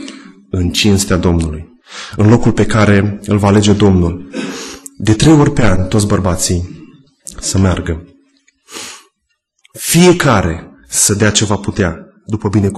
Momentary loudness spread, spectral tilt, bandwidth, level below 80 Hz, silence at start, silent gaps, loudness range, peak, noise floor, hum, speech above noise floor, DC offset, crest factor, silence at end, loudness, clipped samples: 19 LU; -5 dB/octave; 13 kHz; -30 dBFS; 0 s; none; 6 LU; 0 dBFS; -67 dBFS; none; 56 dB; under 0.1%; 12 dB; 0 s; -12 LUFS; under 0.1%